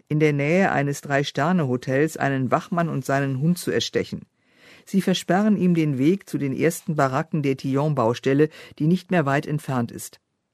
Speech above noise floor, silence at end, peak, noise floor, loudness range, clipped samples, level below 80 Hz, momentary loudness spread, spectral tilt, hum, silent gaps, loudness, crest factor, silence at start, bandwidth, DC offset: 31 dB; 0.45 s; -4 dBFS; -52 dBFS; 2 LU; under 0.1%; -62 dBFS; 6 LU; -6.5 dB/octave; none; none; -22 LUFS; 18 dB; 0.1 s; 13.5 kHz; under 0.1%